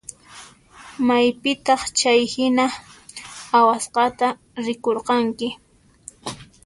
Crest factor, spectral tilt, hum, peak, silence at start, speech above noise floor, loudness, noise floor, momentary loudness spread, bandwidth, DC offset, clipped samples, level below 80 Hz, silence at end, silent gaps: 18 dB; -2.5 dB/octave; none; -4 dBFS; 0.1 s; 27 dB; -20 LUFS; -46 dBFS; 20 LU; 11.5 kHz; under 0.1%; under 0.1%; -58 dBFS; 0.2 s; none